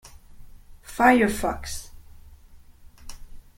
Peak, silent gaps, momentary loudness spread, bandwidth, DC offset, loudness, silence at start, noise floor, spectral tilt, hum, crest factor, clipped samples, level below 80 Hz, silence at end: -4 dBFS; none; 26 LU; 16.5 kHz; under 0.1%; -22 LUFS; 0.05 s; -48 dBFS; -4.5 dB/octave; none; 22 dB; under 0.1%; -44 dBFS; 0.15 s